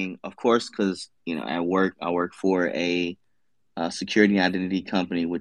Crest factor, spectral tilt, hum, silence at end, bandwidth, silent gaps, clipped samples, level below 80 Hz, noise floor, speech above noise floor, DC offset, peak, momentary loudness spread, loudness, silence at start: 22 dB; -5.5 dB/octave; none; 0 s; 11 kHz; none; under 0.1%; -70 dBFS; -79 dBFS; 54 dB; under 0.1%; -4 dBFS; 11 LU; -25 LUFS; 0 s